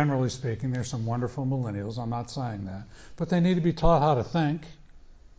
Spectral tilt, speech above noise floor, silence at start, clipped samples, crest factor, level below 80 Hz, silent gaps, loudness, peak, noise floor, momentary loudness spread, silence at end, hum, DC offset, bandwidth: -7 dB/octave; 23 dB; 0 s; under 0.1%; 18 dB; -42 dBFS; none; -28 LUFS; -8 dBFS; -49 dBFS; 13 LU; 0.2 s; none; under 0.1%; 8 kHz